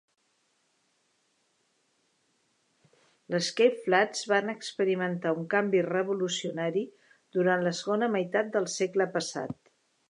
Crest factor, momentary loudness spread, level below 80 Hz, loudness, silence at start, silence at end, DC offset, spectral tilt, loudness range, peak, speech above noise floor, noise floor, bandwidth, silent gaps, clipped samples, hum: 22 dB; 9 LU; -80 dBFS; -28 LUFS; 3.3 s; 0.6 s; under 0.1%; -4.5 dB/octave; 4 LU; -8 dBFS; 45 dB; -73 dBFS; 11 kHz; none; under 0.1%; none